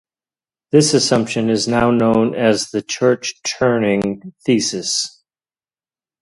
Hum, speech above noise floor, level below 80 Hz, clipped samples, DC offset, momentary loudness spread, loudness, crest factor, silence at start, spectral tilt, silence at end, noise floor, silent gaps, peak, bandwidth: none; over 74 dB; -50 dBFS; under 0.1%; under 0.1%; 7 LU; -17 LUFS; 18 dB; 0.75 s; -4 dB/octave; 1.15 s; under -90 dBFS; none; 0 dBFS; 11.5 kHz